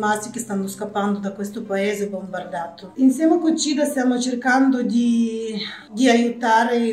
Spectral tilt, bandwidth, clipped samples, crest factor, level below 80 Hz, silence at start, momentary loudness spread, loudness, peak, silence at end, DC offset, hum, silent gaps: -4.5 dB/octave; 15 kHz; under 0.1%; 16 dB; -70 dBFS; 0 s; 12 LU; -20 LUFS; -4 dBFS; 0 s; under 0.1%; none; none